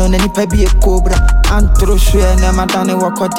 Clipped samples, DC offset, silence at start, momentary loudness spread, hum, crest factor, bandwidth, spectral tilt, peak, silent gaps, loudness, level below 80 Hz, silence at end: under 0.1%; under 0.1%; 0 s; 2 LU; none; 10 dB; 16.5 kHz; -5.5 dB/octave; 0 dBFS; none; -12 LUFS; -10 dBFS; 0 s